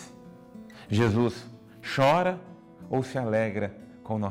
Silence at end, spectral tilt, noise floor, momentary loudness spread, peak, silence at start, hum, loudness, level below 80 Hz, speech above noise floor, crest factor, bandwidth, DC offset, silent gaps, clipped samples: 0 s; -6.5 dB/octave; -48 dBFS; 24 LU; -14 dBFS; 0 s; none; -27 LUFS; -62 dBFS; 23 dB; 14 dB; 15 kHz; under 0.1%; none; under 0.1%